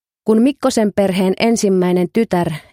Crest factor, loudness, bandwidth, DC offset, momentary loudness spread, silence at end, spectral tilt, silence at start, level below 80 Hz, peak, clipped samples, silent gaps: 14 dB; -15 LUFS; 16 kHz; under 0.1%; 3 LU; 0.15 s; -6 dB/octave; 0.25 s; -52 dBFS; -2 dBFS; under 0.1%; none